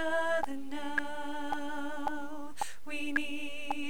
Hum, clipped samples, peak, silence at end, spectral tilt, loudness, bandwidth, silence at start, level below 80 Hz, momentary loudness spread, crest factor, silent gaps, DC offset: none; under 0.1%; -16 dBFS; 0 s; -3.5 dB/octave; -36 LUFS; over 20 kHz; 0 s; -68 dBFS; 8 LU; 18 dB; none; 2%